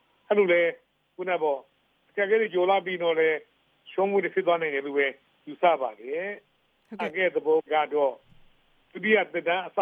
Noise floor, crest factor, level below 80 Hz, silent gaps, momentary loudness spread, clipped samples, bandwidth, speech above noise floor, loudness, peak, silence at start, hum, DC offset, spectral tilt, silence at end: -60 dBFS; 18 dB; -74 dBFS; none; 11 LU; under 0.1%; 4.7 kHz; 35 dB; -26 LUFS; -8 dBFS; 0.3 s; none; under 0.1%; -7 dB/octave; 0 s